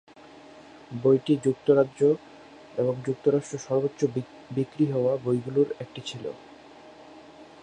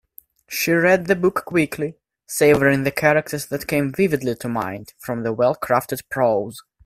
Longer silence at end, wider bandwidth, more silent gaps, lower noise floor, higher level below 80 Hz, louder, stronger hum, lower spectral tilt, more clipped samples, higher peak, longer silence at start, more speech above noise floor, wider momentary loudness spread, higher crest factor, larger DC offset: about the same, 0.2 s vs 0.25 s; second, 9.6 kHz vs 16 kHz; neither; about the same, -49 dBFS vs -48 dBFS; second, -68 dBFS vs -54 dBFS; second, -26 LUFS vs -20 LUFS; neither; first, -7 dB/octave vs -5.5 dB/octave; neither; second, -8 dBFS vs 0 dBFS; about the same, 0.55 s vs 0.5 s; second, 24 dB vs 28 dB; about the same, 14 LU vs 12 LU; about the same, 20 dB vs 20 dB; neither